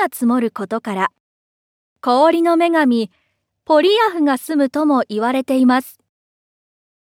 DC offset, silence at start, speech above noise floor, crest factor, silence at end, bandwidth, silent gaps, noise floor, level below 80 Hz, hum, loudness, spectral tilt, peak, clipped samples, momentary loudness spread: under 0.1%; 0 s; over 74 dB; 16 dB; 1.2 s; 16.5 kHz; 1.20-1.96 s; under -90 dBFS; -72 dBFS; none; -16 LUFS; -4.5 dB/octave; -2 dBFS; under 0.1%; 9 LU